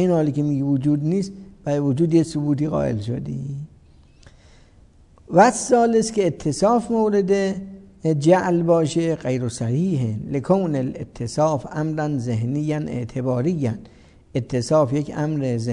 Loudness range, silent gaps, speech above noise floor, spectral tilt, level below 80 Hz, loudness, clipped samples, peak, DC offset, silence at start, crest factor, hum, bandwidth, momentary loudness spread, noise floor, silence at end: 5 LU; none; 31 dB; -7 dB/octave; -50 dBFS; -21 LUFS; under 0.1%; -2 dBFS; under 0.1%; 0 s; 20 dB; none; 11 kHz; 11 LU; -51 dBFS; 0 s